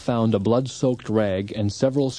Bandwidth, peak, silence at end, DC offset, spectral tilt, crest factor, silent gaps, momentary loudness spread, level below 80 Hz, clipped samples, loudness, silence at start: 10 kHz; -8 dBFS; 0 s; under 0.1%; -7 dB/octave; 14 dB; none; 4 LU; -56 dBFS; under 0.1%; -23 LUFS; 0 s